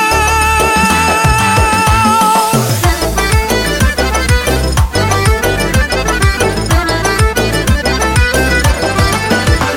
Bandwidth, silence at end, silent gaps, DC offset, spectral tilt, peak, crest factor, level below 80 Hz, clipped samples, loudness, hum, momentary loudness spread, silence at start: 17 kHz; 0 s; none; under 0.1%; -4 dB/octave; 0 dBFS; 10 dB; -18 dBFS; under 0.1%; -11 LUFS; none; 3 LU; 0 s